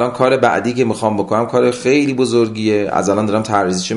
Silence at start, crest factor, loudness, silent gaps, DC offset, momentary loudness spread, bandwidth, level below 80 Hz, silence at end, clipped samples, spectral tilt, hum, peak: 0 s; 14 dB; -15 LUFS; none; under 0.1%; 3 LU; 11.5 kHz; -50 dBFS; 0 s; under 0.1%; -5.5 dB/octave; none; 0 dBFS